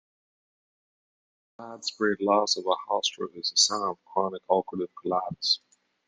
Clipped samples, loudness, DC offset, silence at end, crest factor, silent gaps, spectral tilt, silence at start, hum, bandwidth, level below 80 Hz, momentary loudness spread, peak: under 0.1%; -27 LUFS; under 0.1%; 0.5 s; 22 dB; none; -2 dB/octave; 1.6 s; none; 10 kHz; -76 dBFS; 12 LU; -6 dBFS